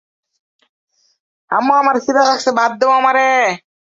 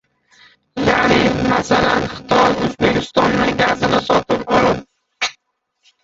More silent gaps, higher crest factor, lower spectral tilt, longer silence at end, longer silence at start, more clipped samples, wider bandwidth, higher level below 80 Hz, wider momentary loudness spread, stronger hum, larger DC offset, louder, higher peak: neither; about the same, 14 dB vs 16 dB; second, -3 dB/octave vs -5 dB/octave; second, 0.4 s vs 0.7 s; first, 1.5 s vs 0.75 s; neither; about the same, 7.8 kHz vs 8 kHz; second, -66 dBFS vs -40 dBFS; second, 6 LU vs 9 LU; neither; neither; first, -13 LUFS vs -16 LUFS; about the same, -2 dBFS vs 0 dBFS